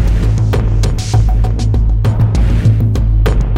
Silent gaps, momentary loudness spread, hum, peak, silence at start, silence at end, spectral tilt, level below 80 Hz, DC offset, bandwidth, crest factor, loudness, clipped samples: none; 2 LU; none; -2 dBFS; 0 s; 0 s; -7 dB/octave; -14 dBFS; under 0.1%; 10 kHz; 8 dB; -13 LUFS; under 0.1%